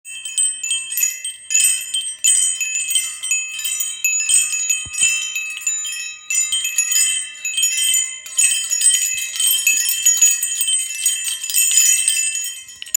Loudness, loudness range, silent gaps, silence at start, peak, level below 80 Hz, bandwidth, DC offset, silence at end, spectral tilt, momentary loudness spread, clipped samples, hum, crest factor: -15 LUFS; 3 LU; none; 0.05 s; 0 dBFS; -66 dBFS; 17 kHz; under 0.1%; 0.05 s; 5.5 dB/octave; 8 LU; under 0.1%; none; 18 dB